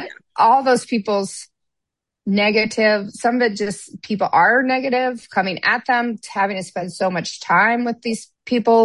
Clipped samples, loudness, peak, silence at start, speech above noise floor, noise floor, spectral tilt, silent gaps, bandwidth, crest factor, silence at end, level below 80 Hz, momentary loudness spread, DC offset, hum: under 0.1%; -18 LUFS; -4 dBFS; 0 s; 64 dB; -82 dBFS; -4.5 dB/octave; none; 11.5 kHz; 16 dB; 0 s; -66 dBFS; 12 LU; under 0.1%; none